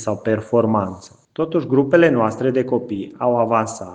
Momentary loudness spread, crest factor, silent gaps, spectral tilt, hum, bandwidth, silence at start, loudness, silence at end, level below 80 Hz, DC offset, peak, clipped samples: 13 LU; 18 dB; none; -7 dB/octave; none; 9.6 kHz; 0 s; -19 LUFS; 0 s; -58 dBFS; under 0.1%; 0 dBFS; under 0.1%